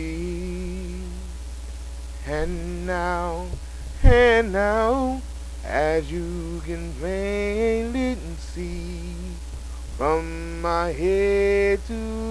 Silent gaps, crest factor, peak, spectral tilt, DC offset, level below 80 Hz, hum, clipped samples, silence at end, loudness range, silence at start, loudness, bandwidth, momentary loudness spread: none; 22 dB; -2 dBFS; -6 dB/octave; 0.3%; -30 dBFS; none; under 0.1%; 0 s; 8 LU; 0 s; -24 LUFS; 11 kHz; 16 LU